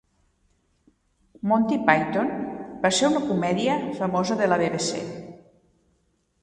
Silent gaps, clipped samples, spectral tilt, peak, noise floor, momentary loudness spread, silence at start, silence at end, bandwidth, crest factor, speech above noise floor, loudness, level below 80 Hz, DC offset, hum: none; under 0.1%; -4.5 dB/octave; -2 dBFS; -69 dBFS; 12 LU; 1.45 s; 1.05 s; 11.5 kHz; 24 dB; 46 dB; -24 LUFS; -60 dBFS; under 0.1%; none